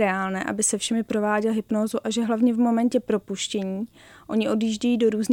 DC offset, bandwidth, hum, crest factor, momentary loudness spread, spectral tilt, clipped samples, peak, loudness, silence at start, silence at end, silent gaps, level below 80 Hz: under 0.1%; 16.5 kHz; none; 14 dB; 7 LU; -4 dB/octave; under 0.1%; -10 dBFS; -24 LUFS; 0 s; 0 s; none; -62 dBFS